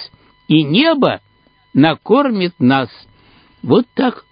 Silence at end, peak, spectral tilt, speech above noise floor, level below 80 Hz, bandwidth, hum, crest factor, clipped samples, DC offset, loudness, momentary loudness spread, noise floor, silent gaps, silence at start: 0.1 s; 0 dBFS; -9.5 dB/octave; 36 dB; -58 dBFS; 5.2 kHz; none; 16 dB; under 0.1%; under 0.1%; -14 LUFS; 13 LU; -49 dBFS; none; 0 s